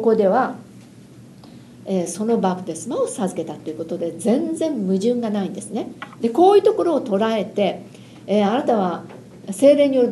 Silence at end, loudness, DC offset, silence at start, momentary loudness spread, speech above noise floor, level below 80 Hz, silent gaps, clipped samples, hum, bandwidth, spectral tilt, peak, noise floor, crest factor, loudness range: 0 s; -20 LUFS; under 0.1%; 0 s; 16 LU; 24 dB; -66 dBFS; none; under 0.1%; none; 12.5 kHz; -6 dB/octave; -2 dBFS; -43 dBFS; 18 dB; 6 LU